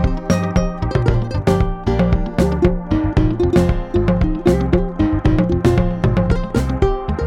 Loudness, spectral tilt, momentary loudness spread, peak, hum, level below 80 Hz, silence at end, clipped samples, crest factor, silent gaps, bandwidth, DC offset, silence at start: -17 LUFS; -8 dB/octave; 3 LU; -2 dBFS; none; -22 dBFS; 0 s; under 0.1%; 14 dB; none; 12.5 kHz; under 0.1%; 0 s